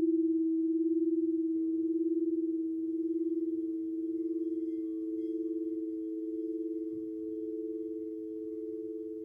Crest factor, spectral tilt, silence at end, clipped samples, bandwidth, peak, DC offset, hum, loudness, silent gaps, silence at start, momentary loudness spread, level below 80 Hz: 12 dB; -10.5 dB/octave; 0 s; under 0.1%; 0.5 kHz; -22 dBFS; under 0.1%; none; -34 LUFS; none; 0 s; 9 LU; -78 dBFS